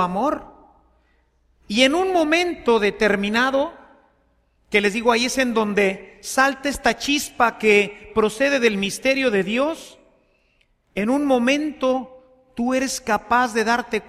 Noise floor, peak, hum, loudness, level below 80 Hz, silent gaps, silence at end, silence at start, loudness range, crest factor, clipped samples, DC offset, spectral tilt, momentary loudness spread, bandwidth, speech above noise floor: -63 dBFS; -2 dBFS; none; -20 LUFS; -50 dBFS; none; 0.05 s; 0 s; 3 LU; 20 dB; under 0.1%; under 0.1%; -3.5 dB/octave; 8 LU; 15.5 kHz; 43 dB